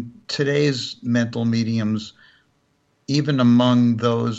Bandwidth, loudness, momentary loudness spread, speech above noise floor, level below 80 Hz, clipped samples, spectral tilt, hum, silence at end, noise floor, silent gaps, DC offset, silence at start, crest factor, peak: 8 kHz; -20 LUFS; 12 LU; 46 dB; -64 dBFS; under 0.1%; -6.5 dB/octave; none; 0 s; -65 dBFS; none; under 0.1%; 0 s; 14 dB; -6 dBFS